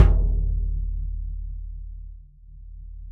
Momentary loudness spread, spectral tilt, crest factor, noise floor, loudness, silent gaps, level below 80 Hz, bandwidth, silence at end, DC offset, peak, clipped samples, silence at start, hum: 22 LU; -9.5 dB/octave; 22 dB; -44 dBFS; -28 LUFS; none; -26 dBFS; 3.1 kHz; 0 s; under 0.1%; -2 dBFS; under 0.1%; 0 s; none